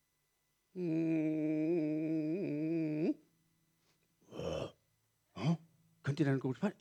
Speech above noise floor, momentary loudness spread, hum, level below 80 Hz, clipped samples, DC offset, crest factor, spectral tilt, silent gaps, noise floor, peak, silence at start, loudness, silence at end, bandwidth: 46 dB; 11 LU; none; -70 dBFS; under 0.1%; under 0.1%; 18 dB; -8 dB/octave; none; -80 dBFS; -20 dBFS; 0.75 s; -37 LUFS; 0.1 s; 8.8 kHz